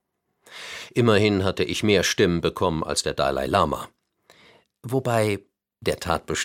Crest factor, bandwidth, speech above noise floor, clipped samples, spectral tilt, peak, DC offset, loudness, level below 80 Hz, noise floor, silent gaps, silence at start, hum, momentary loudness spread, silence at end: 20 dB; 16.5 kHz; 37 dB; under 0.1%; -4.5 dB/octave; -4 dBFS; under 0.1%; -23 LUFS; -48 dBFS; -59 dBFS; none; 0.5 s; none; 16 LU; 0 s